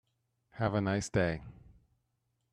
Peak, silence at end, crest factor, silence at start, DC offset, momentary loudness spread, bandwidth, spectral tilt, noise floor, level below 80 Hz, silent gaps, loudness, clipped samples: -16 dBFS; 1 s; 20 dB; 0.55 s; under 0.1%; 11 LU; 11 kHz; -6 dB/octave; -80 dBFS; -58 dBFS; none; -33 LUFS; under 0.1%